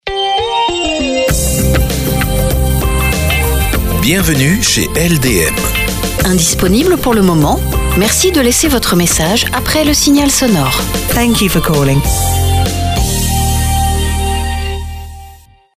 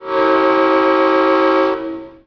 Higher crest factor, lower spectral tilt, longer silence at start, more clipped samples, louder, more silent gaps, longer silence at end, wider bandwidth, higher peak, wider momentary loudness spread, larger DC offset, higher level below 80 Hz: about the same, 12 dB vs 12 dB; second, -4 dB/octave vs -5.5 dB/octave; about the same, 0.05 s vs 0 s; neither; first, -11 LUFS vs -14 LUFS; neither; first, 0.4 s vs 0.15 s; first, 16 kHz vs 5.4 kHz; about the same, 0 dBFS vs -2 dBFS; about the same, 5 LU vs 7 LU; neither; first, -20 dBFS vs -54 dBFS